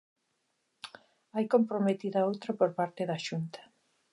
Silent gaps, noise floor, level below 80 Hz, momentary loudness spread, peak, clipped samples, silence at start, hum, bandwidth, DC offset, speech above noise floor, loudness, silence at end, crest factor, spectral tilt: none; -78 dBFS; -84 dBFS; 20 LU; -12 dBFS; under 0.1%; 0.85 s; none; 11.5 kHz; under 0.1%; 48 dB; -31 LUFS; 0.5 s; 20 dB; -6.5 dB/octave